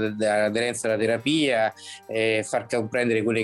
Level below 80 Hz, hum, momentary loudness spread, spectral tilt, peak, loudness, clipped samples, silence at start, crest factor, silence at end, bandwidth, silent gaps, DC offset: -68 dBFS; none; 5 LU; -4.5 dB/octave; -12 dBFS; -24 LUFS; under 0.1%; 0 s; 12 dB; 0 s; 12.5 kHz; none; under 0.1%